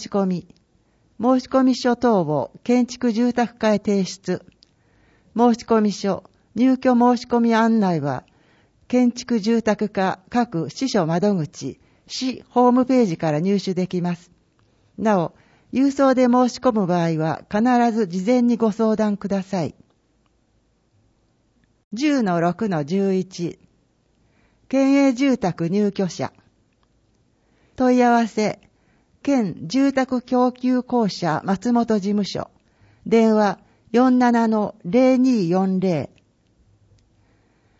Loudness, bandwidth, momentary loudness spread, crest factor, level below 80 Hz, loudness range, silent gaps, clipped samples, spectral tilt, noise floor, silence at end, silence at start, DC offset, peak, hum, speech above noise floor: -20 LUFS; 8 kHz; 11 LU; 16 dB; -60 dBFS; 5 LU; 21.84-21.91 s; under 0.1%; -6.5 dB/octave; -64 dBFS; 1.75 s; 0 s; under 0.1%; -4 dBFS; none; 45 dB